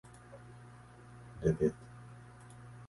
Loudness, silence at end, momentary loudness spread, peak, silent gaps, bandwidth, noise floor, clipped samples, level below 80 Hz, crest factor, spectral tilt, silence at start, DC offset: -34 LUFS; 0 s; 23 LU; -18 dBFS; none; 11.5 kHz; -55 dBFS; under 0.1%; -56 dBFS; 22 dB; -8.5 dB/octave; 0.3 s; under 0.1%